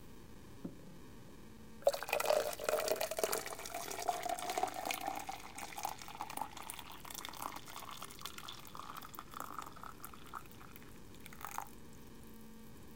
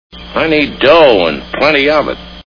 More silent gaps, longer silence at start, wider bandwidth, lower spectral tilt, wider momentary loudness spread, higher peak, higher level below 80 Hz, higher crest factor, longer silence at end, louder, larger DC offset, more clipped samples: neither; second, 0 s vs 0.15 s; first, 17 kHz vs 5.4 kHz; second, -2.5 dB/octave vs -6 dB/octave; first, 20 LU vs 9 LU; second, -16 dBFS vs 0 dBFS; second, -66 dBFS vs -36 dBFS; first, 26 dB vs 12 dB; about the same, 0 s vs 0.1 s; second, -41 LUFS vs -10 LUFS; second, 0.2% vs 0.5%; second, under 0.1% vs 0.7%